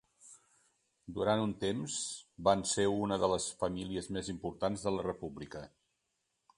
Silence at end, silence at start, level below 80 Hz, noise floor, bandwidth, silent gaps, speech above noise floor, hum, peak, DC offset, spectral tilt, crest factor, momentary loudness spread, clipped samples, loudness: 0.9 s; 0.25 s; -60 dBFS; -83 dBFS; 11.5 kHz; none; 48 dB; none; -12 dBFS; under 0.1%; -4.5 dB/octave; 24 dB; 13 LU; under 0.1%; -35 LUFS